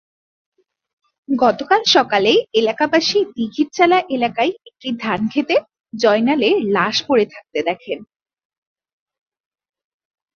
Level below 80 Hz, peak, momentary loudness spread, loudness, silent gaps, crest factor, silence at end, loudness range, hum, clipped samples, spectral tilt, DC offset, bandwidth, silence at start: -62 dBFS; -2 dBFS; 10 LU; -17 LUFS; none; 18 dB; 2.3 s; 6 LU; none; under 0.1%; -4 dB/octave; under 0.1%; 7 kHz; 1.3 s